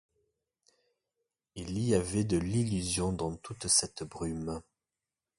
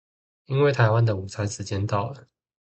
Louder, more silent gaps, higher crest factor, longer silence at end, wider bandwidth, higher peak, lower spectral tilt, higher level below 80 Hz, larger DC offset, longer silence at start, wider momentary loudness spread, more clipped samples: second, -31 LUFS vs -24 LUFS; neither; about the same, 22 dB vs 20 dB; first, 0.8 s vs 0.4 s; first, 11.5 kHz vs 8.8 kHz; second, -12 dBFS vs -4 dBFS; second, -4.5 dB/octave vs -6.5 dB/octave; about the same, -52 dBFS vs -48 dBFS; neither; first, 1.55 s vs 0.5 s; first, 14 LU vs 11 LU; neither